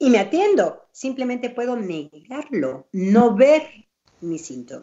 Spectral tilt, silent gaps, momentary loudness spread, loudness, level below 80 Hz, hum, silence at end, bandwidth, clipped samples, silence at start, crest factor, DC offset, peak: -6 dB/octave; none; 18 LU; -20 LUFS; -66 dBFS; none; 0 s; 8 kHz; under 0.1%; 0 s; 18 dB; under 0.1%; -2 dBFS